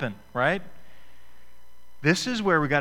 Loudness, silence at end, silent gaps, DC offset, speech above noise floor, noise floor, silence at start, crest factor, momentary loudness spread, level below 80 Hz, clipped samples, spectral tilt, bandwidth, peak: -25 LUFS; 0 s; none; under 0.1%; 35 dB; -60 dBFS; 0 s; 20 dB; 8 LU; -54 dBFS; under 0.1%; -5 dB/octave; 16.5 kHz; -6 dBFS